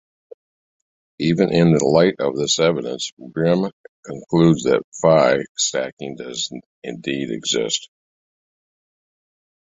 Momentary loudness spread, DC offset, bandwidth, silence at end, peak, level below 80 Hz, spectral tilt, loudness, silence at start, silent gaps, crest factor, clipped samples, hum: 14 LU; under 0.1%; 8.2 kHz; 1.9 s; -2 dBFS; -56 dBFS; -4.5 dB/octave; -19 LUFS; 1.2 s; 3.12-3.17 s, 3.73-4.03 s, 4.84-4.92 s, 5.49-5.55 s, 5.93-5.97 s, 6.66-6.82 s; 18 dB; under 0.1%; none